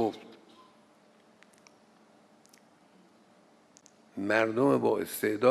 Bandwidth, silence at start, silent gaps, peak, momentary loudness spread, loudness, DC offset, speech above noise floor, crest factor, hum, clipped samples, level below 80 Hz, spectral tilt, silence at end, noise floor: 15.5 kHz; 0 s; none; -10 dBFS; 21 LU; -28 LUFS; under 0.1%; 35 dB; 22 dB; none; under 0.1%; -80 dBFS; -5.5 dB/octave; 0 s; -61 dBFS